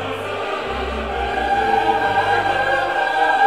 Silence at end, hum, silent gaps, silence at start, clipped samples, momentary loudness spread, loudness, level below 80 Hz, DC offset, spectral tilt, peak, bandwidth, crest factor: 0 s; none; none; 0 s; under 0.1%; 7 LU; -19 LUFS; -38 dBFS; 0.3%; -4.5 dB/octave; -4 dBFS; 13.5 kHz; 14 dB